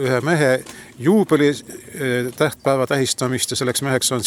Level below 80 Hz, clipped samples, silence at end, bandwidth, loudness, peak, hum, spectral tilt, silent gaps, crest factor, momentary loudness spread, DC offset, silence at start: -58 dBFS; under 0.1%; 0 s; 18 kHz; -19 LUFS; -4 dBFS; none; -4.5 dB/octave; none; 16 dB; 7 LU; under 0.1%; 0 s